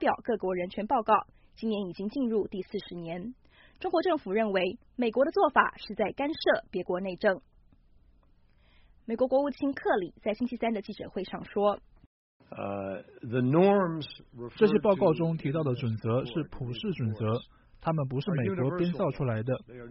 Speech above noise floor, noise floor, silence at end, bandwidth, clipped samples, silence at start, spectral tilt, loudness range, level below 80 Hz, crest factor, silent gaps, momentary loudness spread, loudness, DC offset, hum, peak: 33 dB; -62 dBFS; 0 s; 5.8 kHz; under 0.1%; 0 s; -5.5 dB/octave; 5 LU; -58 dBFS; 22 dB; 12.06-12.40 s; 13 LU; -30 LUFS; under 0.1%; none; -6 dBFS